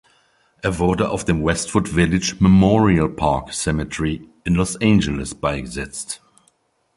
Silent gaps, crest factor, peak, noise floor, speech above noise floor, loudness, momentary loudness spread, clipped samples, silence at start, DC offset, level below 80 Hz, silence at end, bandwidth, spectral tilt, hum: none; 18 dB; -2 dBFS; -63 dBFS; 44 dB; -19 LUFS; 13 LU; under 0.1%; 0.65 s; under 0.1%; -36 dBFS; 0.8 s; 11.5 kHz; -5.5 dB/octave; none